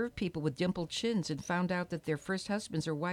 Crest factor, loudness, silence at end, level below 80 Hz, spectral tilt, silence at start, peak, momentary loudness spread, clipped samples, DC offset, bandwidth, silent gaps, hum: 16 dB; -35 LUFS; 0 s; -62 dBFS; -5.5 dB/octave; 0 s; -18 dBFS; 3 LU; under 0.1%; under 0.1%; 14 kHz; none; none